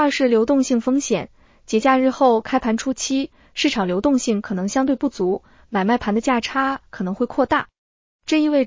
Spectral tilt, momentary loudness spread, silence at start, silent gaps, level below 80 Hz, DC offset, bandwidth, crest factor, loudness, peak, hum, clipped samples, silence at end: -4.5 dB/octave; 8 LU; 0 s; 7.78-8.19 s; -50 dBFS; under 0.1%; 7.6 kHz; 16 dB; -20 LUFS; -4 dBFS; none; under 0.1%; 0 s